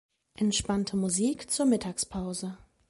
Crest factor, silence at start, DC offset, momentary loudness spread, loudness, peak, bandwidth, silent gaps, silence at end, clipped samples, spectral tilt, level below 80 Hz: 16 dB; 0.4 s; under 0.1%; 9 LU; -29 LUFS; -14 dBFS; 11.5 kHz; none; 0.35 s; under 0.1%; -4 dB/octave; -54 dBFS